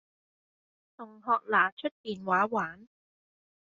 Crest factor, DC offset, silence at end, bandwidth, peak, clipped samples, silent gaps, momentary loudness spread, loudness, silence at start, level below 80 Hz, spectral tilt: 22 dB; under 0.1%; 0.95 s; 7.4 kHz; -12 dBFS; under 0.1%; 1.72-1.77 s, 1.91-2.04 s; 16 LU; -29 LUFS; 1 s; -78 dBFS; -2.5 dB/octave